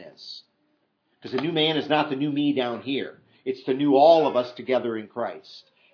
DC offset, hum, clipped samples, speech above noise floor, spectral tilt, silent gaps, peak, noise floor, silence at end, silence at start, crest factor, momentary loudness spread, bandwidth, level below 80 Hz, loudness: under 0.1%; none; under 0.1%; 47 dB; -7 dB/octave; none; -6 dBFS; -70 dBFS; 0.35 s; 0 s; 20 dB; 22 LU; 5.4 kHz; -82 dBFS; -23 LUFS